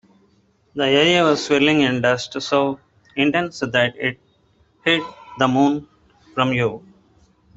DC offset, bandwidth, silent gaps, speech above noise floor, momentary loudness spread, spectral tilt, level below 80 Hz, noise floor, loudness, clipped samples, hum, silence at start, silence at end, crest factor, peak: under 0.1%; 8 kHz; none; 41 dB; 13 LU; -5 dB/octave; -58 dBFS; -59 dBFS; -19 LUFS; under 0.1%; none; 0.75 s; 0.8 s; 20 dB; 0 dBFS